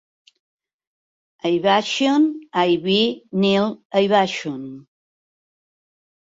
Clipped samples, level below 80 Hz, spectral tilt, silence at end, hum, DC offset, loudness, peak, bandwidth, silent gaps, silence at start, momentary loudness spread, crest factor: under 0.1%; -66 dBFS; -5 dB/octave; 1.5 s; none; under 0.1%; -19 LUFS; -4 dBFS; 7.8 kHz; 3.85-3.90 s; 1.45 s; 10 LU; 18 dB